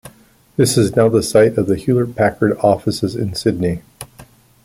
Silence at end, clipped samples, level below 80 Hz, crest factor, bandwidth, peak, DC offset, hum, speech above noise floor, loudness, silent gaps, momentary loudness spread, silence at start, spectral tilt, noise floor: 0.4 s; under 0.1%; -46 dBFS; 16 dB; 16.5 kHz; -2 dBFS; under 0.1%; none; 33 dB; -16 LUFS; none; 14 LU; 0.05 s; -5.5 dB/octave; -48 dBFS